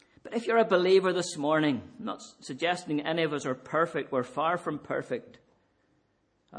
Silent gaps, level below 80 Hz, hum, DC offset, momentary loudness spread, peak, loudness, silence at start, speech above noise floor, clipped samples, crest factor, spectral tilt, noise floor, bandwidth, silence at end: none; -76 dBFS; none; under 0.1%; 14 LU; -12 dBFS; -29 LUFS; 0.25 s; 43 dB; under 0.1%; 18 dB; -5 dB/octave; -72 dBFS; 10 kHz; 0 s